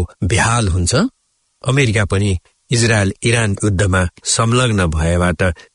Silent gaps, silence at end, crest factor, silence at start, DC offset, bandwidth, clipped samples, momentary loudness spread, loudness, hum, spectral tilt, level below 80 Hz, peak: none; 0.15 s; 14 dB; 0 s; under 0.1%; 11 kHz; under 0.1%; 5 LU; -16 LUFS; none; -4.5 dB/octave; -34 dBFS; -2 dBFS